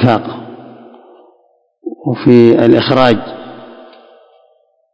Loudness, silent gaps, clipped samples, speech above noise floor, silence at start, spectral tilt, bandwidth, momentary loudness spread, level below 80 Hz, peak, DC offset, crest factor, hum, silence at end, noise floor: -10 LUFS; none; 1%; 46 dB; 0 s; -8.5 dB/octave; 8 kHz; 24 LU; -48 dBFS; 0 dBFS; under 0.1%; 14 dB; none; 1.3 s; -55 dBFS